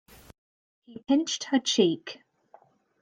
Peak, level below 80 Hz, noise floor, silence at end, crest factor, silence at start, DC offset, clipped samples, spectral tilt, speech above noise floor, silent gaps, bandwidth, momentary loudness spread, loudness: -10 dBFS; -68 dBFS; -59 dBFS; 0.9 s; 20 dB; 0.9 s; under 0.1%; under 0.1%; -3.5 dB/octave; 33 dB; none; 15.5 kHz; 23 LU; -26 LUFS